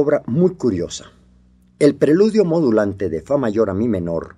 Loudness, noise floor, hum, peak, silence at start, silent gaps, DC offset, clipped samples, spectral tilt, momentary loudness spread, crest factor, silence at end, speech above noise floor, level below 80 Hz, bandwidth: -18 LUFS; -52 dBFS; none; -2 dBFS; 0 s; none; under 0.1%; under 0.1%; -7 dB/octave; 9 LU; 16 dB; 0.1 s; 35 dB; -50 dBFS; 11.5 kHz